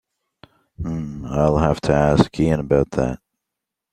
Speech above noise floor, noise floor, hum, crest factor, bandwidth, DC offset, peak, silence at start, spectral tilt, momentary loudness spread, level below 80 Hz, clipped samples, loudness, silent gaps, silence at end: 65 dB; -83 dBFS; none; 20 dB; 10 kHz; under 0.1%; 0 dBFS; 0.8 s; -7.5 dB/octave; 12 LU; -36 dBFS; under 0.1%; -19 LUFS; none; 0.75 s